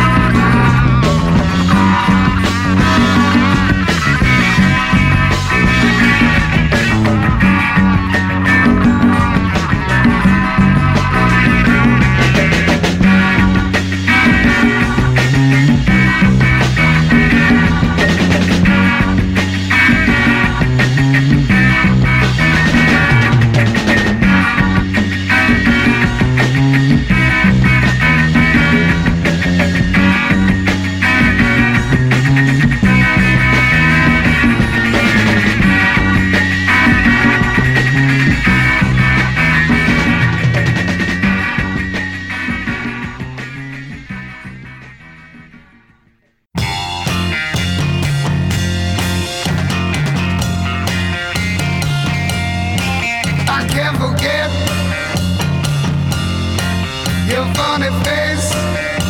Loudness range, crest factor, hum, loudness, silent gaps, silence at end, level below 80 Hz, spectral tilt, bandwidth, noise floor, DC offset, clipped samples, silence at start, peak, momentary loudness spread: 6 LU; 12 dB; none; -12 LUFS; none; 0 s; -24 dBFS; -5.5 dB/octave; 16.5 kHz; -56 dBFS; under 0.1%; under 0.1%; 0 s; 0 dBFS; 7 LU